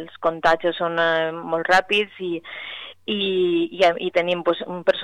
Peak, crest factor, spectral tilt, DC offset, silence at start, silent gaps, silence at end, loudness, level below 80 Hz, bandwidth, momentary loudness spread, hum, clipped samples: -6 dBFS; 14 dB; -5 dB/octave; 0.2%; 0 s; none; 0 s; -21 LUFS; -56 dBFS; 11 kHz; 11 LU; none; under 0.1%